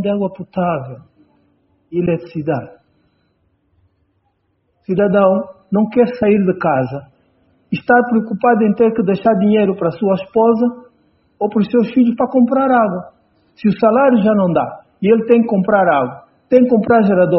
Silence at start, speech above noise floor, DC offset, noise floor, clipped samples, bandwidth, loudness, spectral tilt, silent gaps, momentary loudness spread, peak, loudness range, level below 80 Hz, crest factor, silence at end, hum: 0 s; 50 dB; under 0.1%; -64 dBFS; under 0.1%; 5.8 kHz; -15 LUFS; -7 dB/octave; none; 10 LU; 0 dBFS; 10 LU; -54 dBFS; 16 dB; 0 s; none